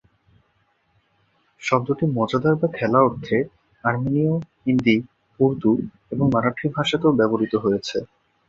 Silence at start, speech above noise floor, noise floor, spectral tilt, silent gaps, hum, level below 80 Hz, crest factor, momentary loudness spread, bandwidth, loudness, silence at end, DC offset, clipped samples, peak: 1.6 s; 45 dB; -66 dBFS; -7 dB/octave; none; none; -54 dBFS; 20 dB; 7 LU; 7.8 kHz; -21 LUFS; 0.45 s; under 0.1%; under 0.1%; -2 dBFS